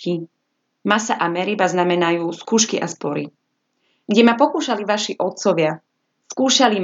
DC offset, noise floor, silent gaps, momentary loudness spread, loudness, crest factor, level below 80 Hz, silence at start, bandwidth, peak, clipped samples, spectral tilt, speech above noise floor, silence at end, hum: under 0.1%; -69 dBFS; none; 12 LU; -19 LUFS; 20 dB; -82 dBFS; 0 s; 8 kHz; 0 dBFS; under 0.1%; -3.5 dB/octave; 51 dB; 0 s; none